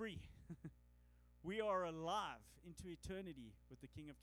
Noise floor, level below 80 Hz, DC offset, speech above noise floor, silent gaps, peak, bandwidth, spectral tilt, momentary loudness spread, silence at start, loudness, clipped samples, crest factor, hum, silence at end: -70 dBFS; -66 dBFS; under 0.1%; 22 dB; none; -30 dBFS; over 20 kHz; -5 dB/octave; 18 LU; 0 s; -48 LUFS; under 0.1%; 18 dB; 60 Hz at -70 dBFS; 0 s